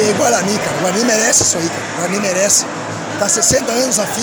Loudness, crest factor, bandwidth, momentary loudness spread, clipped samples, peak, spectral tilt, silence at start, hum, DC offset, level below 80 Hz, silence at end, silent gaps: -14 LUFS; 14 dB; over 20 kHz; 9 LU; under 0.1%; 0 dBFS; -2.5 dB/octave; 0 s; none; under 0.1%; -46 dBFS; 0 s; none